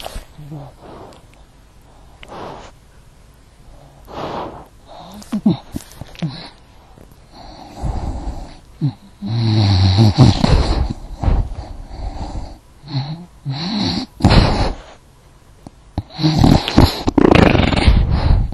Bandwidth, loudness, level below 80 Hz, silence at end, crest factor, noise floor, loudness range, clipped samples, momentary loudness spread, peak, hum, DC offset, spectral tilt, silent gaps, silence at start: 13 kHz; -16 LUFS; -24 dBFS; 0 s; 18 dB; -46 dBFS; 18 LU; under 0.1%; 24 LU; 0 dBFS; none; under 0.1%; -6.5 dB/octave; none; 0 s